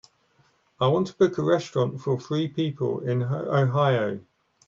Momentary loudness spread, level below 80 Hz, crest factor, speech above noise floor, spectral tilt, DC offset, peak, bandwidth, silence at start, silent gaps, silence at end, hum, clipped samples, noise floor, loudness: 6 LU; -66 dBFS; 16 dB; 40 dB; -7.5 dB/octave; under 0.1%; -8 dBFS; 7.4 kHz; 0.8 s; none; 0.45 s; none; under 0.1%; -64 dBFS; -25 LUFS